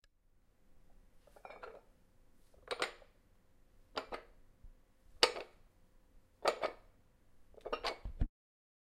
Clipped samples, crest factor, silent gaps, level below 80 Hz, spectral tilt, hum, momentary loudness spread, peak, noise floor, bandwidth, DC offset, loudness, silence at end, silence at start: under 0.1%; 36 dB; none; -52 dBFS; -2.5 dB/octave; none; 22 LU; -8 dBFS; -70 dBFS; 15.5 kHz; under 0.1%; -39 LUFS; 0.7 s; 0.7 s